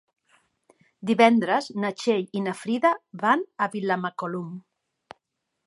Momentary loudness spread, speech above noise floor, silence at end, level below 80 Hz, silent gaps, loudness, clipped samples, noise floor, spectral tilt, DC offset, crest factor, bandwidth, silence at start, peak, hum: 14 LU; 55 dB; 1.05 s; -78 dBFS; none; -24 LUFS; under 0.1%; -79 dBFS; -5.5 dB/octave; under 0.1%; 24 dB; 11.5 kHz; 1 s; -2 dBFS; none